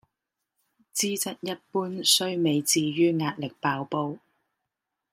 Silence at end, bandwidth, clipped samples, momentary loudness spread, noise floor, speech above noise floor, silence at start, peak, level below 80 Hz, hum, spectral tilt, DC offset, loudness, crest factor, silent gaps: 0.95 s; 16.5 kHz; under 0.1%; 11 LU; -85 dBFS; 58 dB; 0.95 s; -8 dBFS; -74 dBFS; none; -3 dB/octave; under 0.1%; -26 LUFS; 22 dB; none